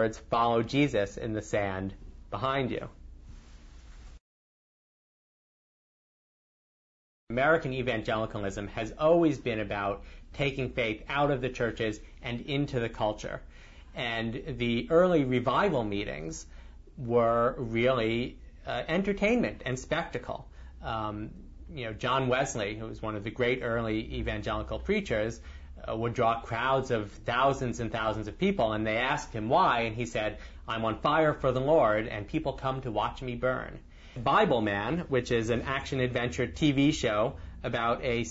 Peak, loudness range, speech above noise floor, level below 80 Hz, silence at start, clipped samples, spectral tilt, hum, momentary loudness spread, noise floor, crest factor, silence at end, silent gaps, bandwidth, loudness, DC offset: -12 dBFS; 5 LU; 21 dB; -48 dBFS; 0 s; under 0.1%; -6 dB/octave; none; 13 LU; -50 dBFS; 18 dB; 0 s; 4.20-7.27 s; 8 kHz; -29 LUFS; under 0.1%